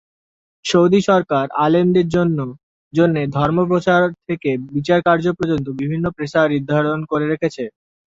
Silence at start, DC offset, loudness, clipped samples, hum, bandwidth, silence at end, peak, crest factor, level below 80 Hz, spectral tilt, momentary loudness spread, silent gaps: 0.65 s; under 0.1%; -17 LUFS; under 0.1%; none; 7.8 kHz; 0.5 s; -2 dBFS; 16 dB; -50 dBFS; -7 dB/octave; 9 LU; 2.63-2.91 s